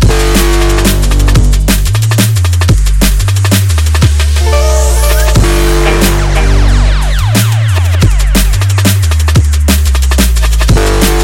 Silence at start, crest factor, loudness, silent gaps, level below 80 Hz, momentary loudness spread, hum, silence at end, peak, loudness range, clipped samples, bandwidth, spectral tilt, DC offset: 0 s; 8 dB; -9 LUFS; none; -10 dBFS; 1 LU; none; 0 s; 0 dBFS; 0 LU; 0.6%; 17.5 kHz; -5 dB/octave; 2%